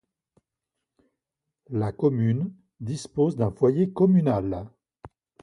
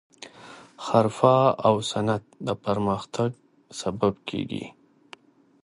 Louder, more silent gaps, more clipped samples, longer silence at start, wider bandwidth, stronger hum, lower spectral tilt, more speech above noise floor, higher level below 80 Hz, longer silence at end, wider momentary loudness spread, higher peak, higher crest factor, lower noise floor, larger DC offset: about the same, -25 LUFS vs -25 LUFS; neither; neither; first, 1.7 s vs 0.2 s; about the same, 11 kHz vs 11.5 kHz; neither; first, -9 dB/octave vs -6 dB/octave; first, 62 dB vs 28 dB; about the same, -54 dBFS vs -58 dBFS; second, 0.35 s vs 0.95 s; second, 14 LU vs 23 LU; second, -8 dBFS vs -4 dBFS; about the same, 18 dB vs 22 dB; first, -85 dBFS vs -51 dBFS; neither